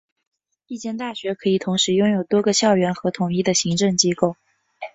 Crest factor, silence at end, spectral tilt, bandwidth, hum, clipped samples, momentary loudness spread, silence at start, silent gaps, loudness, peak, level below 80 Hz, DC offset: 18 dB; 0.05 s; -4 dB/octave; 8.4 kHz; none; under 0.1%; 11 LU; 0.7 s; none; -20 LUFS; -4 dBFS; -60 dBFS; under 0.1%